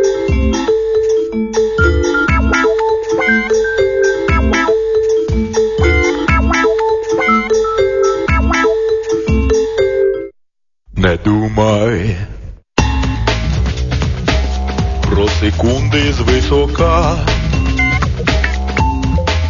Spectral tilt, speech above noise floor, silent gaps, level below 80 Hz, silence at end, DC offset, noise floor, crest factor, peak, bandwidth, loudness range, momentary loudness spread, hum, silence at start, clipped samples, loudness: -6 dB/octave; 47 dB; none; -20 dBFS; 0 s; under 0.1%; -59 dBFS; 14 dB; 0 dBFS; 7.4 kHz; 3 LU; 4 LU; none; 0 s; under 0.1%; -14 LUFS